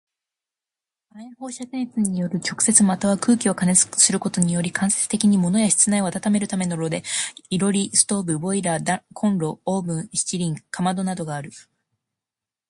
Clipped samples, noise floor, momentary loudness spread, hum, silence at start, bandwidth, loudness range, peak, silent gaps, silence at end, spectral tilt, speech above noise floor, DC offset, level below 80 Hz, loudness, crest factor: under 0.1%; -89 dBFS; 11 LU; none; 1.15 s; 11.5 kHz; 7 LU; 0 dBFS; none; 1.1 s; -4 dB/octave; 68 dB; under 0.1%; -62 dBFS; -20 LUFS; 22 dB